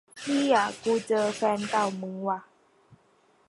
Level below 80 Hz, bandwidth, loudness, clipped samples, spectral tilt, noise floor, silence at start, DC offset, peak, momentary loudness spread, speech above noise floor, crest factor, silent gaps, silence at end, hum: -72 dBFS; 11.5 kHz; -27 LUFS; under 0.1%; -4.5 dB/octave; -64 dBFS; 0.15 s; under 0.1%; -10 dBFS; 9 LU; 38 dB; 18 dB; none; 0.55 s; none